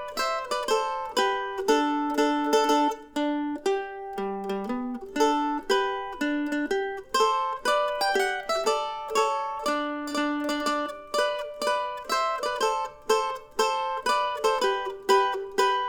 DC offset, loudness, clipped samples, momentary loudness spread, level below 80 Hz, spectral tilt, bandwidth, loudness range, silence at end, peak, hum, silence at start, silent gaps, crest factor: under 0.1%; -26 LUFS; under 0.1%; 6 LU; -58 dBFS; -2.5 dB/octave; over 20 kHz; 3 LU; 0 s; -10 dBFS; none; 0 s; none; 18 dB